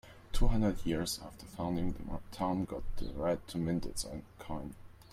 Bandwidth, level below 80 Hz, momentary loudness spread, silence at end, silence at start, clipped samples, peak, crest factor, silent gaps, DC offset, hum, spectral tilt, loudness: 15 kHz; -40 dBFS; 12 LU; 0.1 s; 0.05 s; under 0.1%; -14 dBFS; 20 dB; none; under 0.1%; none; -5.5 dB/octave; -37 LUFS